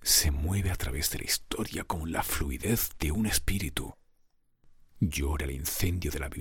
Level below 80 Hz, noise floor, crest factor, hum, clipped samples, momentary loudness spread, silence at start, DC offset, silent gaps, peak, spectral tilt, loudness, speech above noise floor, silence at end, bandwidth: -36 dBFS; -66 dBFS; 20 dB; none; under 0.1%; 6 LU; 0 s; under 0.1%; none; -10 dBFS; -3.5 dB/octave; -30 LUFS; 36 dB; 0 s; 17.5 kHz